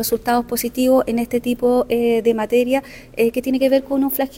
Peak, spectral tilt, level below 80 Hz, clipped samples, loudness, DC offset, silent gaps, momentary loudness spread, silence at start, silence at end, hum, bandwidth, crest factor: -4 dBFS; -4.5 dB/octave; -46 dBFS; under 0.1%; -18 LUFS; under 0.1%; none; 4 LU; 0 s; 0 s; none; 18.5 kHz; 14 dB